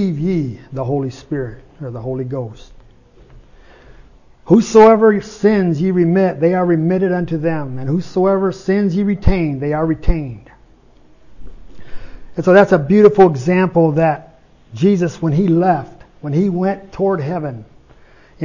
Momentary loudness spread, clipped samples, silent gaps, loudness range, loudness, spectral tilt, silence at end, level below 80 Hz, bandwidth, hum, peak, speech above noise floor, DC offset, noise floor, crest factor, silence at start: 15 LU; under 0.1%; none; 10 LU; -15 LUFS; -8 dB/octave; 0 s; -34 dBFS; 7.4 kHz; none; 0 dBFS; 32 dB; under 0.1%; -46 dBFS; 16 dB; 0 s